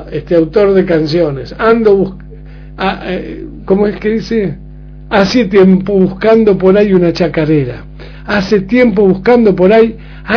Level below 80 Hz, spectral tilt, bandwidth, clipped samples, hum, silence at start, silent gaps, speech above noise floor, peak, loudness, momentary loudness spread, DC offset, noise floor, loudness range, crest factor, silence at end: -32 dBFS; -7.5 dB/octave; 5.4 kHz; 0.6%; none; 0 s; none; 20 dB; 0 dBFS; -10 LUFS; 12 LU; under 0.1%; -30 dBFS; 5 LU; 10 dB; 0 s